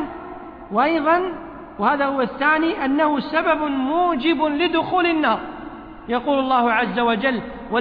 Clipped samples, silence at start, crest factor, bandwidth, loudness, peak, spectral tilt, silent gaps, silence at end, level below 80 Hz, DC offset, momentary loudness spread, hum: under 0.1%; 0 s; 14 dB; 5.2 kHz; -20 LUFS; -6 dBFS; -8 dB/octave; none; 0 s; -50 dBFS; under 0.1%; 16 LU; none